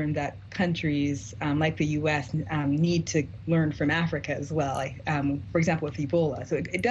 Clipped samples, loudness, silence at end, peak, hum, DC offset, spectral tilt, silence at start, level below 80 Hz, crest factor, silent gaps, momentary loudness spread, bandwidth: under 0.1%; -27 LUFS; 0 s; -12 dBFS; none; under 0.1%; -6 dB/octave; 0 s; -50 dBFS; 16 dB; none; 5 LU; 9 kHz